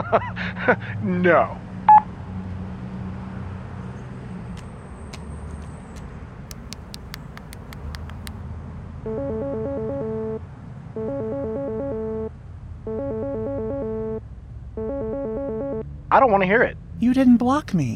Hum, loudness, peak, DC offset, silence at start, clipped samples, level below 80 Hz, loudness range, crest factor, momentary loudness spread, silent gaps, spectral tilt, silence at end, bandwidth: none; -23 LUFS; -4 dBFS; under 0.1%; 0 s; under 0.1%; -42 dBFS; 16 LU; 20 dB; 21 LU; none; -7.5 dB/octave; 0 s; 15.5 kHz